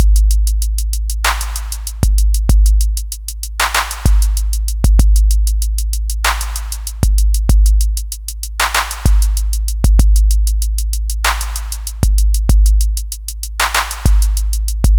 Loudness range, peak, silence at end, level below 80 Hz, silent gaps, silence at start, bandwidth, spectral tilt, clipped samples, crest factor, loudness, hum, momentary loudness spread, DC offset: 1 LU; 0 dBFS; 0 s; -14 dBFS; none; 0 s; over 20 kHz; -3.5 dB/octave; under 0.1%; 12 dB; -16 LUFS; none; 9 LU; under 0.1%